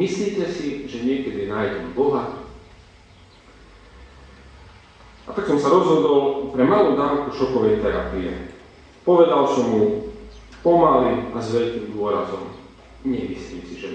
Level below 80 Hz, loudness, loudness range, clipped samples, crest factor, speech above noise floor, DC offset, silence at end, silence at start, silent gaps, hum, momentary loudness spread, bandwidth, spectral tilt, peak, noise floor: -46 dBFS; -20 LUFS; 9 LU; under 0.1%; 18 dB; 29 dB; under 0.1%; 0 s; 0 s; none; none; 17 LU; 8.8 kHz; -6.5 dB/octave; -4 dBFS; -49 dBFS